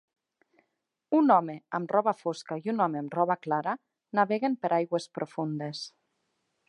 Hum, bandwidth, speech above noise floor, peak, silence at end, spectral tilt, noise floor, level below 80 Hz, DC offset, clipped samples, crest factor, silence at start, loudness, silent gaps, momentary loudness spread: none; 11 kHz; 53 dB; -8 dBFS; 0.8 s; -6.5 dB/octave; -81 dBFS; -86 dBFS; under 0.1%; under 0.1%; 22 dB; 1.1 s; -29 LUFS; none; 11 LU